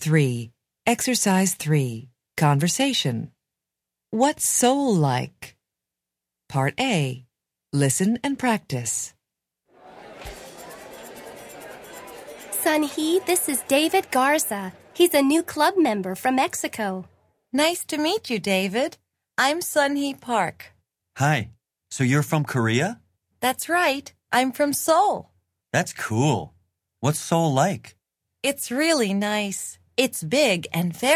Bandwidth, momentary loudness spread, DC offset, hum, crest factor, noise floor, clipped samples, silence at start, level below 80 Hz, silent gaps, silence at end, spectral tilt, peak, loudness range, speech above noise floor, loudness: 16 kHz; 20 LU; under 0.1%; none; 20 dB; -86 dBFS; under 0.1%; 0 s; -60 dBFS; none; 0 s; -4 dB/octave; -4 dBFS; 5 LU; 64 dB; -23 LUFS